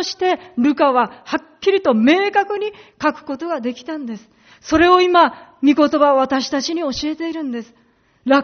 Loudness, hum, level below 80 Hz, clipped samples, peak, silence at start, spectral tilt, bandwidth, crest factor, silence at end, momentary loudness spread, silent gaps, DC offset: -17 LUFS; none; -50 dBFS; under 0.1%; 0 dBFS; 0 s; -2 dB/octave; 6.6 kHz; 16 dB; 0 s; 14 LU; none; under 0.1%